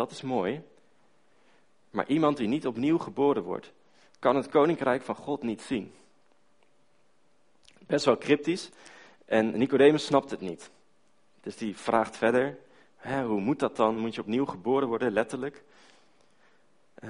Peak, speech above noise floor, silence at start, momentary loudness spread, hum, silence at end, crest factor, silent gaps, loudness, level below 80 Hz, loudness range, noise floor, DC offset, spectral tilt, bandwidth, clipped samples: -8 dBFS; 42 dB; 0 s; 13 LU; none; 0 s; 22 dB; none; -28 LUFS; -66 dBFS; 5 LU; -69 dBFS; under 0.1%; -6 dB/octave; 10.5 kHz; under 0.1%